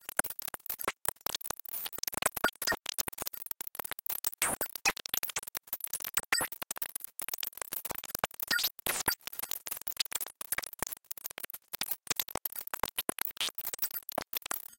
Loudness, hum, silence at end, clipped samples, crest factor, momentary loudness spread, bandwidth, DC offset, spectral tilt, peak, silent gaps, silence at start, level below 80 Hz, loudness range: -34 LUFS; none; 0.05 s; under 0.1%; 30 dB; 8 LU; 17.5 kHz; under 0.1%; 0 dB/octave; -8 dBFS; none; 0.05 s; -64 dBFS; 3 LU